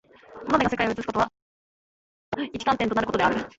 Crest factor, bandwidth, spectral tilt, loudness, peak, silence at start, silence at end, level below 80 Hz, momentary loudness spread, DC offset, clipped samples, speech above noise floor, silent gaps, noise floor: 20 dB; 8 kHz; -5.5 dB/octave; -25 LUFS; -6 dBFS; 0.3 s; 0.1 s; -52 dBFS; 10 LU; under 0.1%; under 0.1%; over 66 dB; 1.42-2.32 s; under -90 dBFS